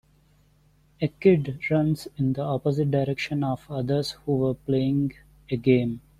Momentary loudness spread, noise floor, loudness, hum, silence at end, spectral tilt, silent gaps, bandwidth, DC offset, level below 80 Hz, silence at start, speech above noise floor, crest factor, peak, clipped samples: 8 LU; -61 dBFS; -25 LUFS; none; 0.2 s; -8 dB/octave; none; 13.5 kHz; under 0.1%; -54 dBFS; 1 s; 37 dB; 18 dB; -6 dBFS; under 0.1%